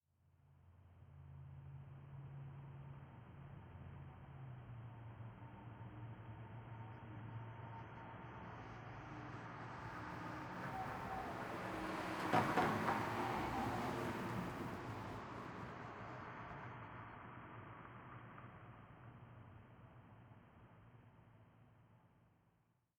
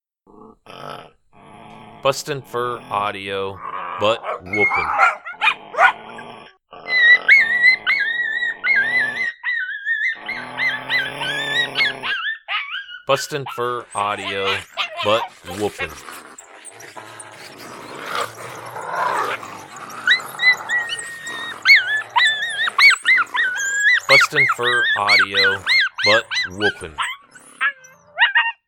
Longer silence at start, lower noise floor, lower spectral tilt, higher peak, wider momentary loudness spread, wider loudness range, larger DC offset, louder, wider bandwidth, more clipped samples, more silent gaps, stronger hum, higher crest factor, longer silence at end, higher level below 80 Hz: about the same, 0.45 s vs 0.4 s; first, -79 dBFS vs -47 dBFS; first, -6 dB/octave vs -1.5 dB/octave; second, -20 dBFS vs 0 dBFS; about the same, 21 LU vs 23 LU; first, 19 LU vs 12 LU; neither; second, -47 LUFS vs -17 LUFS; first, over 20 kHz vs 18 kHz; neither; neither; neither; first, 28 dB vs 20 dB; first, 0.7 s vs 0.15 s; second, -68 dBFS vs -60 dBFS